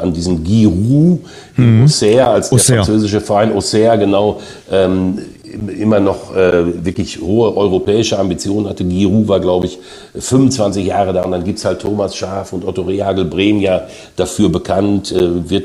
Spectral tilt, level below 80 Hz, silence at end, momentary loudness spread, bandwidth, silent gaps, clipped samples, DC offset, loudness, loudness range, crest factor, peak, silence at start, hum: -6 dB/octave; -38 dBFS; 0 s; 10 LU; 14 kHz; none; under 0.1%; under 0.1%; -13 LUFS; 5 LU; 12 dB; 0 dBFS; 0 s; none